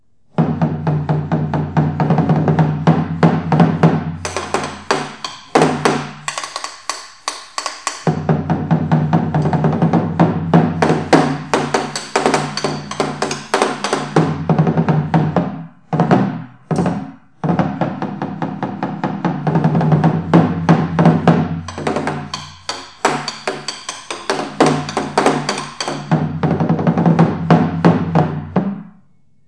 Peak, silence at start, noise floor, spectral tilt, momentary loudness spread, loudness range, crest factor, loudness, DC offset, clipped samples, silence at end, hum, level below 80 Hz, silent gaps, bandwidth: 0 dBFS; 0.4 s; -55 dBFS; -6.5 dB/octave; 11 LU; 5 LU; 16 dB; -17 LUFS; 0.4%; under 0.1%; 0.6 s; none; -52 dBFS; none; 11 kHz